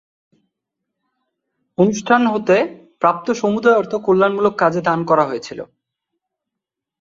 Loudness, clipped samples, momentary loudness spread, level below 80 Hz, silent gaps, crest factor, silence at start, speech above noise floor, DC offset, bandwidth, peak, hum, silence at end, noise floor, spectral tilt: -17 LUFS; under 0.1%; 11 LU; -62 dBFS; none; 16 dB; 1.8 s; 67 dB; under 0.1%; 7.6 kHz; -2 dBFS; none; 1.35 s; -83 dBFS; -6 dB/octave